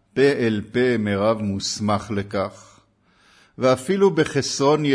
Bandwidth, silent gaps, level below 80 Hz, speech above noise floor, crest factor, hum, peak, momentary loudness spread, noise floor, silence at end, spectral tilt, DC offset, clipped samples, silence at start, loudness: 11 kHz; none; -56 dBFS; 39 dB; 16 dB; none; -6 dBFS; 7 LU; -59 dBFS; 0 s; -5 dB/octave; under 0.1%; under 0.1%; 0.15 s; -21 LUFS